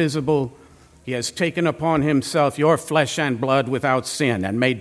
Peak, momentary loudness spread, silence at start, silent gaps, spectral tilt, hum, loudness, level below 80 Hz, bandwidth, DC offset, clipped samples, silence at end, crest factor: -2 dBFS; 7 LU; 0 s; none; -5 dB/octave; none; -21 LUFS; -54 dBFS; 11 kHz; under 0.1%; under 0.1%; 0 s; 18 dB